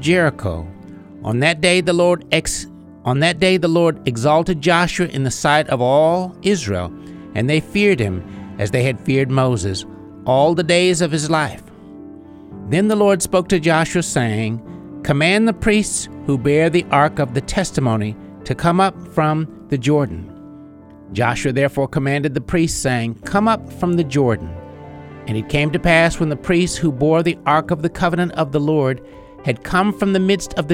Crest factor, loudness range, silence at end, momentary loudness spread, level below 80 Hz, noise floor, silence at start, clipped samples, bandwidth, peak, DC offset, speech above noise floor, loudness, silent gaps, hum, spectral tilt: 16 dB; 3 LU; 0 s; 13 LU; -40 dBFS; -40 dBFS; 0 s; under 0.1%; 16 kHz; 0 dBFS; under 0.1%; 23 dB; -17 LUFS; none; none; -5.5 dB/octave